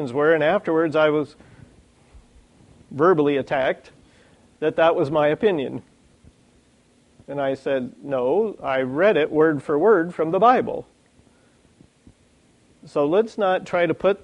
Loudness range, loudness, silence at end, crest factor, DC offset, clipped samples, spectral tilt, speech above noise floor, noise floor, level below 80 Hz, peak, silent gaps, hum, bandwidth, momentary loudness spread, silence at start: 6 LU; -21 LUFS; 0.05 s; 18 dB; under 0.1%; under 0.1%; -7 dB/octave; 38 dB; -58 dBFS; -60 dBFS; -4 dBFS; none; none; 9.6 kHz; 10 LU; 0 s